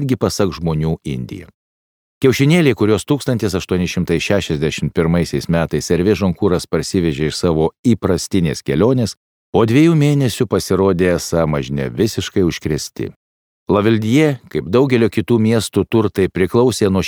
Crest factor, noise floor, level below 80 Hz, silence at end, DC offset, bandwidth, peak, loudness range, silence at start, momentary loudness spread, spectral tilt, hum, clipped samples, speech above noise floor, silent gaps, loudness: 14 dB; under -90 dBFS; -40 dBFS; 0 s; under 0.1%; 20 kHz; 0 dBFS; 2 LU; 0 s; 7 LU; -6 dB/octave; none; under 0.1%; over 75 dB; 1.54-2.21 s, 7.79-7.84 s, 9.17-9.53 s, 13.16-13.66 s; -16 LUFS